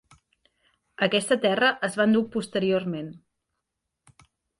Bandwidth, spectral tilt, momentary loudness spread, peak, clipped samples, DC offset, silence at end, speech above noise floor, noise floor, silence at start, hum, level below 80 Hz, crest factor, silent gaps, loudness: 11.5 kHz; -4.5 dB/octave; 10 LU; -8 dBFS; under 0.1%; under 0.1%; 1.4 s; 58 dB; -82 dBFS; 1 s; none; -68 dBFS; 18 dB; none; -24 LUFS